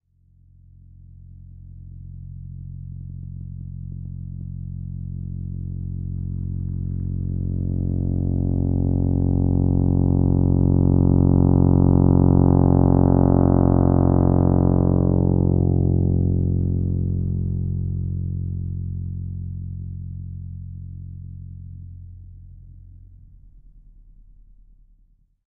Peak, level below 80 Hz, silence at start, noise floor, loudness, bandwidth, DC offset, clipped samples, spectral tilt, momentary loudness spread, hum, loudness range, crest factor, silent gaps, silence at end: -4 dBFS; -32 dBFS; 1.3 s; -59 dBFS; -20 LUFS; 1.7 kHz; under 0.1%; under 0.1%; -13 dB/octave; 20 LU; none; 21 LU; 18 dB; none; 2.3 s